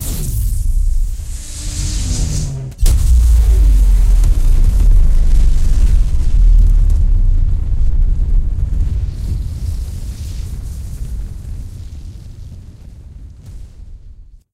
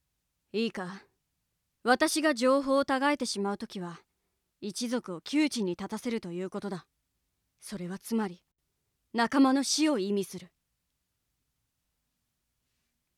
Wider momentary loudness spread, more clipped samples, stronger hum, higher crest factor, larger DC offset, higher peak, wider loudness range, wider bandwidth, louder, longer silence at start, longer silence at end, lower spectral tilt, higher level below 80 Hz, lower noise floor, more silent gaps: first, 21 LU vs 16 LU; neither; neither; second, 12 dB vs 22 dB; neither; first, 0 dBFS vs -10 dBFS; first, 15 LU vs 7 LU; about the same, 15 kHz vs 15 kHz; first, -17 LUFS vs -30 LUFS; second, 0 s vs 0.55 s; second, 0.2 s vs 2.7 s; first, -5.5 dB/octave vs -4 dB/octave; first, -12 dBFS vs -72 dBFS; second, -37 dBFS vs -81 dBFS; neither